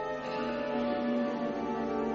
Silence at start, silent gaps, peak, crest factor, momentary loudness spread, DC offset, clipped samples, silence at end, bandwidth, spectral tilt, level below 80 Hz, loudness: 0 s; none; -20 dBFS; 12 dB; 3 LU; under 0.1%; under 0.1%; 0 s; 7.2 kHz; -4 dB/octave; -60 dBFS; -33 LUFS